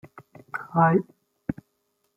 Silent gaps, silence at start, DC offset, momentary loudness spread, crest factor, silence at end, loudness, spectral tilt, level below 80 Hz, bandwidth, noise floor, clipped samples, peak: none; 0.55 s; under 0.1%; 19 LU; 22 dB; 0.65 s; -24 LUFS; -10.5 dB/octave; -60 dBFS; 2.9 kHz; -74 dBFS; under 0.1%; -6 dBFS